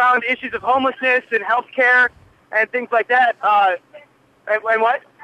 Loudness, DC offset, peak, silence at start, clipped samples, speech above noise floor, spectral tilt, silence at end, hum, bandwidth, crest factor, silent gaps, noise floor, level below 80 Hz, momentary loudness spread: -17 LUFS; under 0.1%; -6 dBFS; 0 s; under 0.1%; 32 dB; -4 dB/octave; 0.25 s; none; 10.5 kHz; 12 dB; none; -49 dBFS; -62 dBFS; 7 LU